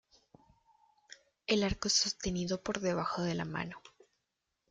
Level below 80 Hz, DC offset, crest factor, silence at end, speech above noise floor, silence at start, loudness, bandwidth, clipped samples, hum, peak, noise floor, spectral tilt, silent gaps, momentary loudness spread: -56 dBFS; under 0.1%; 22 dB; 0.85 s; 51 dB; 1.1 s; -33 LUFS; 9.6 kHz; under 0.1%; none; -14 dBFS; -85 dBFS; -3.5 dB/octave; none; 13 LU